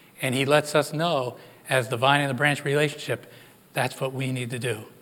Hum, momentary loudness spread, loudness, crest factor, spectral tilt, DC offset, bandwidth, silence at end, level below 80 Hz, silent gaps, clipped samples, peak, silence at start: none; 11 LU; -25 LUFS; 22 dB; -4.5 dB/octave; under 0.1%; 18 kHz; 0.15 s; -76 dBFS; none; under 0.1%; -4 dBFS; 0.2 s